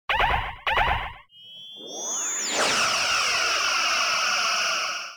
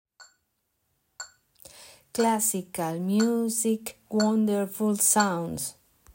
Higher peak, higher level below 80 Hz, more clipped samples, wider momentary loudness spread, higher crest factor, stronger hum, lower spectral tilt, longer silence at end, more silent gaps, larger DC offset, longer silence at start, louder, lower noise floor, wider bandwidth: about the same, -10 dBFS vs -10 dBFS; first, -42 dBFS vs -68 dBFS; neither; second, 13 LU vs 19 LU; about the same, 16 dB vs 18 dB; neither; second, 0 dB/octave vs -4 dB/octave; second, 0 s vs 0.4 s; neither; neither; about the same, 0.1 s vs 0.2 s; first, -22 LUFS vs -26 LUFS; second, -46 dBFS vs -76 dBFS; first, 19.5 kHz vs 16.5 kHz